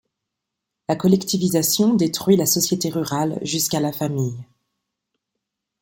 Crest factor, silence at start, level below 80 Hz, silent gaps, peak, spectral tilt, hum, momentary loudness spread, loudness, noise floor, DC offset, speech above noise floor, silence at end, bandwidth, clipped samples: 18 dB; 0.9 s; -60 dBFS; none; -4 dBFS; -4.5 dB/octave; none; 9 LU; -20 LUFS; -82 dBFS; under 0.1%; 62 dB; 1.4 s; 17 kHz; under 0.1%